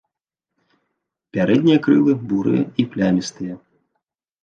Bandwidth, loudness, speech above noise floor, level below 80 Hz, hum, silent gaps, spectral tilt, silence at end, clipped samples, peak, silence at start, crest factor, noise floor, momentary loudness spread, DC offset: 8.8 kHz; -18 LUFS; 67 dB; -58 dBFS; none; none; -7 dB/octave; 0.85 s; under 0.1%; -4 dBFS; 1.35 s; 16 dB; -84 dBFS; 15 LU; under 0.1%